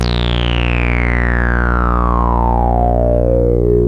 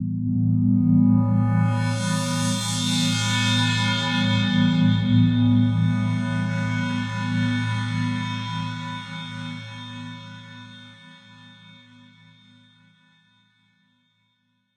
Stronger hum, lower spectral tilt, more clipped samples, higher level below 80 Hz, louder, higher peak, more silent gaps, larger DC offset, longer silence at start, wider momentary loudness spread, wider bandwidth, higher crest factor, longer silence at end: first, 60 Hz at -15 dBFS vs none; first, -7.5 dB/octave vs -5 dB/octave; neither; first, -16 dBFS vs -54 dBFS; first, -14 LUFS vs -22 LUFS; first, 0 dBFS vs -8 dBFS; neither; first, 1% vs under 0.1%; about the same, 0 s vs 0 s; second, 2 LU vs 17 LU; second, 6.4 kHz vs 13 kHz; about the same, 12 dB vs 16 dB; second, 0 s vs 3.8 s